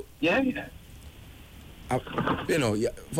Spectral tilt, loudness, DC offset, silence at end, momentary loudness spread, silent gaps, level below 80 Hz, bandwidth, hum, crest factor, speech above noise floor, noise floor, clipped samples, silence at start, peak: -5.5 dB/octave; -28 LUFS; under 0.1%; 0 s; 23 LU; none; -50 dBFS; 16 kHz; none; 14 dB; 20 dB; -47 dBFS; under 0.1%; 0 s; -16 dBFS